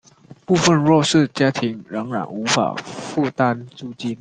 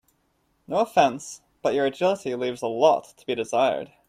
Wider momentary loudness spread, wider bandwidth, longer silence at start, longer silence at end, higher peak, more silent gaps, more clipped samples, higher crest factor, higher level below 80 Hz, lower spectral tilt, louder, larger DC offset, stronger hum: first, 13 LU vs 9 LU; second, 9.8 kHz vs 14.5 kHz; second, 0.5 s vs 0.7 s; second, 0.05 s vs 0.25 s; first, -2 dBFS vs -6 dBFS; neither; neither; about the same, 18 dB vs 20 dB; first, -56 dBFS vs -68 dBFS; about the same, -5 dB/octave vs -4.5 dB/octave; first, -19 LUFS vs -24 LUFS; neither; neither